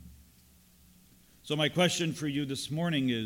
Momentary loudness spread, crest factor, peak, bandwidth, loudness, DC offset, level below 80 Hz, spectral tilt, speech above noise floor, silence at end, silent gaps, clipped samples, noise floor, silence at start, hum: 8 LU; 18 dB; -14 dBFS; 17 kHz; -30 LUFS; under 0.1%; -62 dBFS; -4.5 dB/octave; 31 dB; 0 s; none; under 0.1%; -60 dBFS; 0 s; none